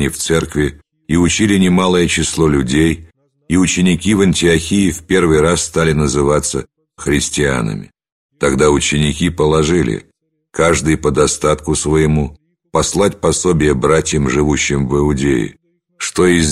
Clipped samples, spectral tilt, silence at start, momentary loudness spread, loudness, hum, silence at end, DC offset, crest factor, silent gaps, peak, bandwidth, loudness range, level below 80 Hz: under 0.1%; -4.5 dB/octave; 0 s; 7 LU; -14 LUFS; none; 0 s; under 0.1%; 14 dB; 8.12-8.29 s; 0 dBFS; 14 kHz; 2 LU; -30 dBFS